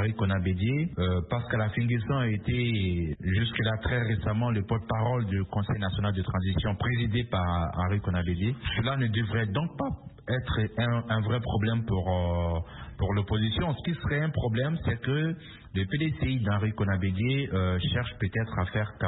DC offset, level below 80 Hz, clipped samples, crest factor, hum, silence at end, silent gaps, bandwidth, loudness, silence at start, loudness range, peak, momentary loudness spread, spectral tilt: under 0.1%; -44 dBFS; under 0.1%; 14 dB; none; 0 s; none; 4.1 kHz; -29 LUFS; 0 s; 1 LU; -14 dBFS; 3 LU; -11 dB/octave